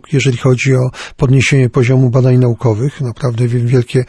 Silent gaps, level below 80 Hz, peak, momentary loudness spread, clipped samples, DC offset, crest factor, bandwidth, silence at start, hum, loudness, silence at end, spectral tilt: none; -38 dBFS; -2 dBFS; 7 LU; under 0.1%; under 0.1%; 10 dB; 10 kHz; 0.1 s; none; -12 LUFS; 0.05 s; -7 dB/octave